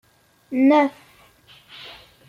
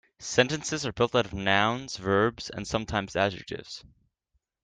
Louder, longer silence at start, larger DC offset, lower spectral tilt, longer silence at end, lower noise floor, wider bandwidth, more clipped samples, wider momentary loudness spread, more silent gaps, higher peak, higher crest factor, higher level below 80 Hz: first, -19 LUFS vs -27 LUFS; first, 0.5 s vs 0.2 s; neither; first, -5.5 dB/octave vs -4 dB/octave; second, 0.4 s vs 0.8 s; second, -52 dBFS vs -77 dBFS; second, 7 kHz vs 9.8 kHz; neither; first, 24 LU vs 14 LU; neither; about the same, -6 dBFS vs -6 dBFS; about the same, 18 dB vs 22 dB; second, -66 dBFS vs -54 dBFS